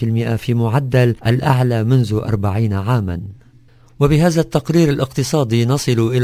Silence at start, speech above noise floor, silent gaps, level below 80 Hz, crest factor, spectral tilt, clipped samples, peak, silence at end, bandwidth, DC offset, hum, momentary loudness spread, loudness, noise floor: 0 s; 31 dB; none; -38 dBFS; 16 dB; -7 dB/octave; under 0.1%; 0 dBFS; 0 s; 16 kHz; under 0.1%; none; 4 LU; -16 LUFS; -47 dBFS